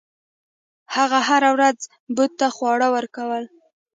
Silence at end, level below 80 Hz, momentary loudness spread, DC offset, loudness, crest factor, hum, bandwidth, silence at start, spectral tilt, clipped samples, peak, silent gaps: 0.5 s; -76 dBFS; 12 LU; under 0.1%; -20 LUFS; 18 dB; none; 9.4 kHz; 0.9 s; -2 dB/octave; under 0.1%; -4 dBFS; 2.00-2.07 s